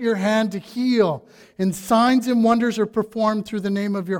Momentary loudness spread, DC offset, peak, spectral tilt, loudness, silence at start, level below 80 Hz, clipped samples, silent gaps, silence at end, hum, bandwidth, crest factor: 7 LU; under 0.1%; -6 dBFS; -6 dB/octave; -20 LUFS; 0 s; -58 dBFS; under 0.1%; none; 0 s; none; 17 kHz; 16 dB